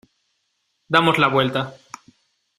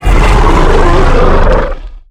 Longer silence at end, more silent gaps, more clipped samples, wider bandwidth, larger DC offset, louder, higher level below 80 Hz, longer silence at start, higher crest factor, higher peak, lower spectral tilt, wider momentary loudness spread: first, 0.85 s vs 0.1 s; neither; second, under 0.1% vs 0.2%; first, 14 kHz vs 10 kHz; neither; second, -18 LUFS vs -9 LUFS; second, -60 dBFS vs -8 dBFS; first, 0.9 s vs 0 s; first, 22 dB vs 6 dB; about the same, 0 dBFS vs 0 dBFS; about the same, -5.5 dB/octave vs -6.5 dB/octave; first, 15 LU vs 7 LU